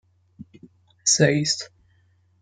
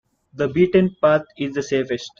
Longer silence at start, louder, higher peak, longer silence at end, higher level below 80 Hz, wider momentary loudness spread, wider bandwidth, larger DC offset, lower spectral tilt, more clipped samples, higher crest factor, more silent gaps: about the same, 0.4 s vs 0.35 s; about the same, -20 LUFS vs -20 LUFS; about the same, -4 dBFS vs -4 dBFS; first, 0.75 s vs 0.1 s; second, -64 dBFS vs -54 dBFS; about the same, 11 LU vs 9 LU; first, 9.6 kHz vs 7.4 kHz; neither; second, -3 dB/octave vs -6.5 dB/octave; neither; first, 22 dB vs 16 dB; neither